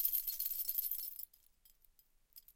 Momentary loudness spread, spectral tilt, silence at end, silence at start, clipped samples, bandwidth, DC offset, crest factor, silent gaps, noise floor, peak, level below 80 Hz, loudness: 16 LU; 2.5 dB/octave; 0.05 s; 0 s; under 0.1%; 17 kHz; under 0.1%; 28 dB; none; -71 dBFS; -16 dBFS; -72 dBFS; -38 LUFS